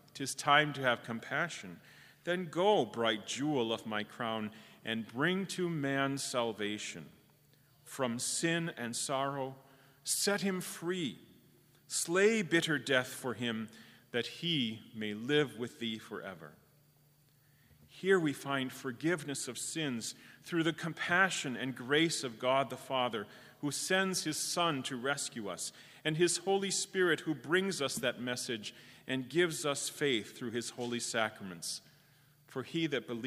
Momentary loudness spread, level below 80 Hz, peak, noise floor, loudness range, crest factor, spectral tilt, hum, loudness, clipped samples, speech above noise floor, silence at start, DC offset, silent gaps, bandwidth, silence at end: 12 LU; -80 dBFS; -12 dBFS; -67 dBFS; 4 LU; 24 dB; -3.5 dB/octave; none; -34 LUFS; under 0.1%; 33 dB; 0.15 s; under 0.1%; none; 15.5 kHz; 0 s